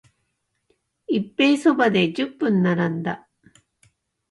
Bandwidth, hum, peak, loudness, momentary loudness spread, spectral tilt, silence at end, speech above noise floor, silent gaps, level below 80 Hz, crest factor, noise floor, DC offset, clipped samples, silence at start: 11.5 kHz; none; -6 dBFS; -21 LUFS; 10 LU; -6.5 dB/octave; 1.15 s; 54 dB; none; -66 dBFS; 18 dB; -74 dBFS; under 0.1%; under 0.1%; 1.1 s